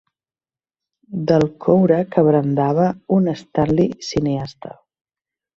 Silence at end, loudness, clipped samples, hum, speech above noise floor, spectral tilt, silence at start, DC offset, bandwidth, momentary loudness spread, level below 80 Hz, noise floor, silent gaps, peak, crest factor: 0.9 s; -18 LUFS; under 0.1%; none; over 73 dB; -8 dB/octave; 1.1 s; under 0.1%; 7.4 kHz; 11 LU; -50 dBFS; under -90 dBFS; none; -2 dBFS; 18 dB